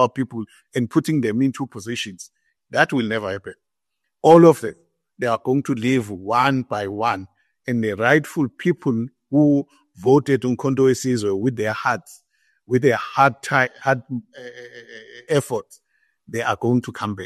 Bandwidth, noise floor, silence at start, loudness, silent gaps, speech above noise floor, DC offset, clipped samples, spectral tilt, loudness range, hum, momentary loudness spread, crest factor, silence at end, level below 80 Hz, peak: 13 kHz; -80 dBFS; 0 s; -20 LUFS; none; 60 dB; under 0.1%; under 0.1%; -6 dB/octave; 5 LU; none; 15 LU; 20 dB; 0 s; -62 dBFS; -2 dBFS